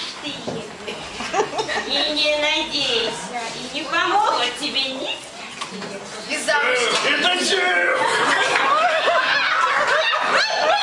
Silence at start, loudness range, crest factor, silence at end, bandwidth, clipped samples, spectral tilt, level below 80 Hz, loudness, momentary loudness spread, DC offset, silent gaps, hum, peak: 0 s; 5 LU; 18 dB; 0 s; 11.5 kHz; under 0.1%; -1.5 dB/octave; -58 dBFS; -19 LUFS; 13 LU; under 0.1%; none; none; -4 dBFS